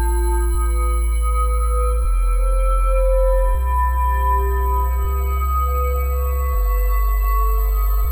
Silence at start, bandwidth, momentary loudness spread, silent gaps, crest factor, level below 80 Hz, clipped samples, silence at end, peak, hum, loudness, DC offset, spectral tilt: 0 s; 19.5 kHz; 3 LU; none; 8 dB; -18 dBFS; under 0.1%; 0 s; -8 dBFS; none; -20 LUFS; under 0.1%; -6.5 dB/octave